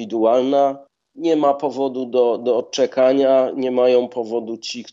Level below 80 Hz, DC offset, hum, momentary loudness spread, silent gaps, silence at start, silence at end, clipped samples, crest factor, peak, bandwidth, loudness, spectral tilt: -78 dBFS; under 0.1%; none; 9 LU; none; 0 s; 0 s; under 0.1%; 14 dB; -4 dBFS; 7.8 kHz; -18 LUFS; -5 dB/octave